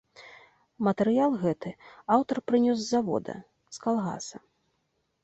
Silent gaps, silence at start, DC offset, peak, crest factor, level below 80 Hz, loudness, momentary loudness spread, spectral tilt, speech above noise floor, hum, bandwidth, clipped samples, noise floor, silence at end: none; 0.2 s; under 0.1%; -8 dBFS; 20 dB; -68 dBFS; -27 LUFS; 17 LU; -6 dB/octave; 49 dB; none; 8.2 kHz; under 0.1%; -76 dBFS; 0.85 s